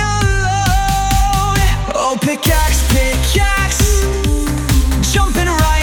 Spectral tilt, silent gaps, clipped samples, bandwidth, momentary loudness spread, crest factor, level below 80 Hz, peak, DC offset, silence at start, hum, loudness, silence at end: -4 dB/octave; none; under 0.1%; 18 kHz; 3 LU; 12 dB; -16 dBFS; -2 dBFS; under 0.1%; 0 s; none; -14 LUFS; 0 s